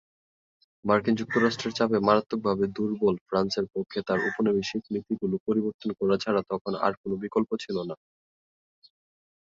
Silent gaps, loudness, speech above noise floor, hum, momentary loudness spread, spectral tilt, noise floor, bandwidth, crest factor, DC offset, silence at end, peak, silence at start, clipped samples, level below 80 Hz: 3.21-3.26 s, 5.40-5.46 s, 5.74-5.79 s, 6.61-6.65 s, 6.97-7.04 s; -27 LUFS; over 63 dB; none; 8 LU; -6 dB/octave; under -90 dBFS; 7.6 kHz; 20 dB; under 0.1%; 1.6 s; -8 dBFS; 0.85 s; under 0.1%; -62 dBFS